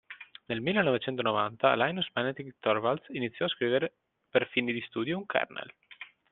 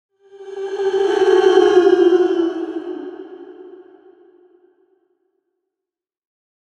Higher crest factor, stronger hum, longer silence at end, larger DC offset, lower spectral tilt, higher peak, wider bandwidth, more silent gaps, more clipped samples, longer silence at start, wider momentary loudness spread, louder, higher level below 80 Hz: first, 24 dB vs 18 dB; neither; second, 0.25 s vs 2.85 s; neither; about the same, -3 dB/octave vs -4 dB/octave; second, -8 dBFS vs 0 dBFS; second, 4.3 kHz vs 8.2 kHz; neither; neither; second, 0.1 s vs 0.35 s; second, 17 LU vs 22 LU; second, -30 LUFS vs -15 LUFS; about the same, -72 dBFS vs -68 dBFS